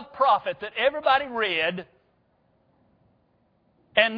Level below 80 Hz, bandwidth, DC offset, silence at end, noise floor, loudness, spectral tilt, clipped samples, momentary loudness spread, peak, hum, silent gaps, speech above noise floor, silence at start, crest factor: -66 dBFS; 5.2 kHz; under 0.1%; 0 s; -67 dBFS; -24 LUFS; -6 dB/octave; under 0.1%; 6 LU; -4 dBFS; none; none; 42 dB; 0 s; 22 dB